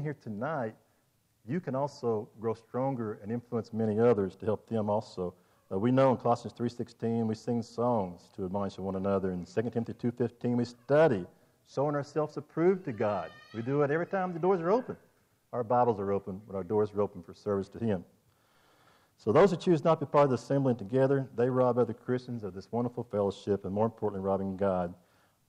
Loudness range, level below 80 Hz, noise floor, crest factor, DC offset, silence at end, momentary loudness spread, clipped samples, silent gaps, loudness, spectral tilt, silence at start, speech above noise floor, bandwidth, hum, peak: 5 LU; -70 dBFS; -71 dBFS; 16 dB; under 0.1%; 0.55 s; 11 LU; under 0.1%; none; -31 LUFS; -8 dB/octave; 0 s; 41 dB; 10.5 kHz; none; -14 dBFS